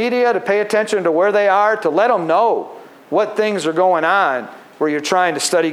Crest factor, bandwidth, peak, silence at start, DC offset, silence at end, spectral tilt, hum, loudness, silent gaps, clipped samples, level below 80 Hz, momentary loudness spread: 14 dB; 15.5 kHz; -2 dBFS; 0 s; under 0.1%; 0 s; -3.5 dB/octave; none; -16 LUFS; none; under 0.1%; -80 dBFS; 7 LU